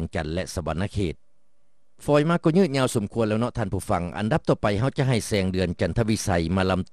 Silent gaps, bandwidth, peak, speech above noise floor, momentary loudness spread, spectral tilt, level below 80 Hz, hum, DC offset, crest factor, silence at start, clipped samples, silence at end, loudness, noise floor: none; 13 kHz; -6 dBFS; 50 dB; 8 LU; -6 dB/octave; -44 dBFS; none; 0.4%; 18 dB; 0 s; under 0.1%; 0.1 s; -24 LUFS; -73 dBFS